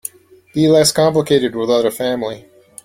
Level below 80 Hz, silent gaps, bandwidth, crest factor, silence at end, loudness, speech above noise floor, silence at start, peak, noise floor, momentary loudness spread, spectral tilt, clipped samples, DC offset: -52 dBFS; none; 16.5 kHz; 14 dB; 0.45 s; -15 LUFS; 20 dB; 0.55 s; -2 dBFS; -35 dBFS; 15 LU; -4.5 dB/octave; under 0.1%; under 0.1%